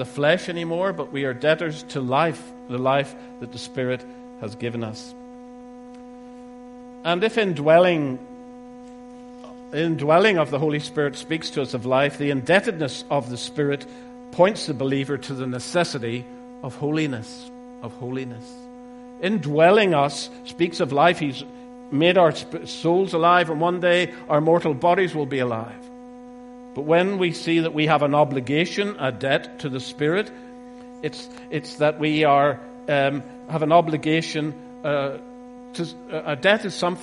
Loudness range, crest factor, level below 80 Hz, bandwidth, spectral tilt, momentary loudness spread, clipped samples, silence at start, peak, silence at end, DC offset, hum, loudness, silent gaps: 8 LU; 22 dB; -62 dBFS; 11.5 kHz; -5.5 dB/octave; 24 LU; under 0.1%; 0 s; 0 dBFS; 0 s; under 0.1%; none; -22 LUFS; none